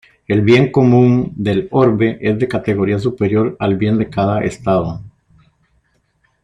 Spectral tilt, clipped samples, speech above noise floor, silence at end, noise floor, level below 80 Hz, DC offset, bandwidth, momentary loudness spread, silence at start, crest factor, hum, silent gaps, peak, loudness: -8.5 dB/octave; under 0.1%; 47 dB; 1.35 s; -61 dBFS; -46 dBFS; under 0.1%; 10 kHz; 7 LU; 0.3 s; 14 dB; none; none; -2 dBFS; -15 LUFS